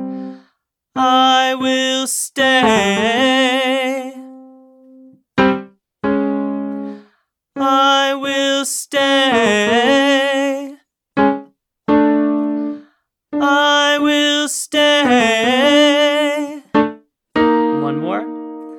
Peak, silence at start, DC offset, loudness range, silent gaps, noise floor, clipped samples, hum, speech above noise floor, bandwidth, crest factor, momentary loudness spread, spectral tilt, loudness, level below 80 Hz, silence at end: 0 dBFS; 0 s; under 0.1%; 6 LU; none; -65 dBFS; under 0.1%; none; 51 dB; 17 kHz; 16 dB; 14 LU; -3 dB/octave; -15 LUFS; -56 dBFS; 0 s